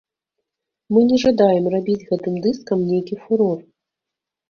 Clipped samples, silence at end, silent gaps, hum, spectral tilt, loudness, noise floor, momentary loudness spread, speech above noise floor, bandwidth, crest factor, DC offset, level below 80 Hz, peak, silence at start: under 0.1%; 0.9 s; none; none; -7.5 dB/octave; -19 LUFS; -85 dBFS; 8 LU; 67 dB; 6.8 kHz; 18 dB; under 0.1%; -56 dBFS; -2 dBFS; 0.9 s